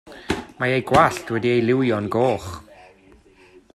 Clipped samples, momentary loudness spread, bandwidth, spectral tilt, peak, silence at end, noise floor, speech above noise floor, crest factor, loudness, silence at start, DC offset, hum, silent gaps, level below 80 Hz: under 0.1%; 11 LU; 13.5 kHz; -6 dB/octave; 0 dBFS; 1.1 s; -52 dBFS; 32 dB; 22 dB; -20 LUFS; 0.05 s; under 0.1%; none; none; -50 dBFS